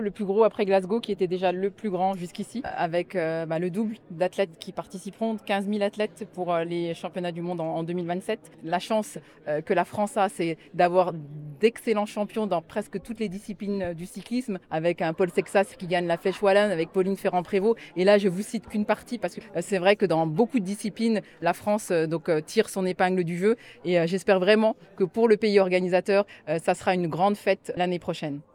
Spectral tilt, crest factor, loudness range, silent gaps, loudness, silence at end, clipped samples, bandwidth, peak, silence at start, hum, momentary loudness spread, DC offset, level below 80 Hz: -6 dB/octave; 20 dB; 6 LU; none; -26 LUFS; 0.15 s; under 0.1%; 17.5 kHz; -6 dBFS; 0 s; none; 10 LU; under 0.1%; -64 dBFS